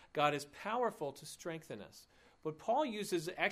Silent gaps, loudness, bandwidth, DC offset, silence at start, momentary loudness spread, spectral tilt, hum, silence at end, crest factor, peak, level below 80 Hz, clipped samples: none; -39 LUFS; 15.5 kHz; under 0.1%; 0 s; 12 LU; -4 dB/octave; none; 0 s; 20 dB; -18 dBFS; -76 dBFS; under 0.1%